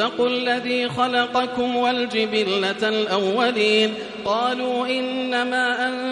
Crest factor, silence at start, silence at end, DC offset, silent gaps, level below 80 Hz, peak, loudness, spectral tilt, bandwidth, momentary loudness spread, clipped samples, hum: 16 dB; 0 s; 0 s; under 0.1%; none; -62 dBFS; -6 dBFS; -21 LUFS; -4 dB/octave; 11 kHz; 4 LU; under 0.1%; none